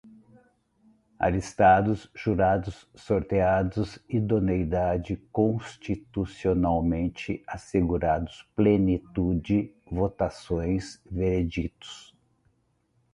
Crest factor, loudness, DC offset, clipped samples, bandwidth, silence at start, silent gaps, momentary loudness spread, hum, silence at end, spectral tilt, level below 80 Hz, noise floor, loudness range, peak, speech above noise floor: 20 dB; -27 LUFS; under 0.1%; under 0.1%; 11 kHz; 0.05 s; none; 12 LU; none; 1.15 s; -7.5 dB/octave; -42 dBFS; -70 dBFS; 4 LU; -8 dBFS; 44 dB